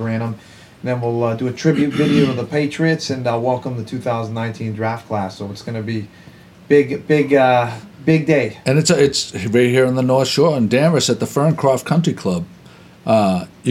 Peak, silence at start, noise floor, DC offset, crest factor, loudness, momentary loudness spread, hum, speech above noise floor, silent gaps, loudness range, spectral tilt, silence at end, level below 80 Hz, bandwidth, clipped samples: -2 dBFS; 0 s; -43 dBFS; under 0.1%; 14 dB; -17 LUFS; 11 LU; none; 26 dB; none; 6 LU; -5.5 dB/octave; 0 s; -54 dBFS; 15 kHz; under 0.1%